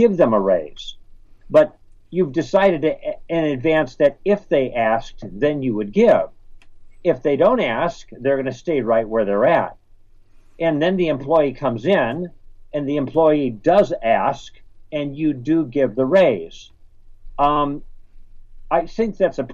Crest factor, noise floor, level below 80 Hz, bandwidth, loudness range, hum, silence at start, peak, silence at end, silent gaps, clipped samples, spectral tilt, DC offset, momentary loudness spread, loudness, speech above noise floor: 16 dB; -47 dBFS; -42 dBFS; 7.4 kHz; 2 LU; none; 0 s; -4 dBFS; 0 s; none; under 0.1%; -7 dB/octave; under 0.1%; 11 LU; -19 LUFS; 29 dB